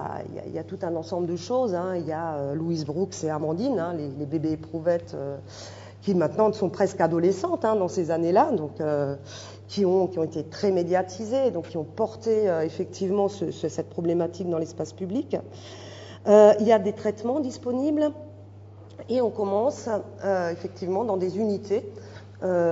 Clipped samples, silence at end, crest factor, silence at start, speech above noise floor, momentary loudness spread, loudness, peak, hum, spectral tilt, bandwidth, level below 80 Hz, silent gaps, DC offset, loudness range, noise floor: under 0.1%; 0 s; 22 dB; 0 s; 20 dB; 13 LU; -26 LUFS; -4 dBFS; none; -7 dB/octave; 7.8 kHz; -66 dBFS; none; under 0.1%; 6 LU; -45 dBFS